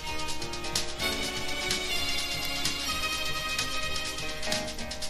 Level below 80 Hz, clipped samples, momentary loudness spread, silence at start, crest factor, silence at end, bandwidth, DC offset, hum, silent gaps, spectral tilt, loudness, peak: -46 dBFS; under 0.1%; 5 LU; 0 s; 20 dB; 0 s; 16 kHz; under 0.1%; none; none; -1.5 dB/octave; -30 LUFS; -12 dBFS